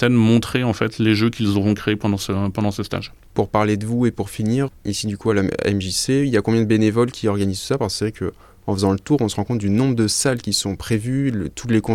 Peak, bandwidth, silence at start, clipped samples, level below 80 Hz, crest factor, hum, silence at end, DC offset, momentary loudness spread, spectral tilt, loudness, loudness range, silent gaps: -4 dBFS; 16 kHz; 0 s; under 0.1%; -46 dBFS; 16 dB; none; 0 s; under 0.1%; 7 LU; -5.5 dB/octave; -20 LUFS; 2 LU; none